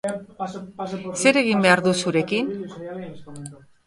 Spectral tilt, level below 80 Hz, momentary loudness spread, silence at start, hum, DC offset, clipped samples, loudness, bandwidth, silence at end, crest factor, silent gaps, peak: -4.5 dB/octave; -62 dBFS; 21 LU; 0.05 s; none; under 0.1%; under 0.1%; -21 LUFS; 11.5 kHz; 0.3 s; 22 dB; none; -2 dBFS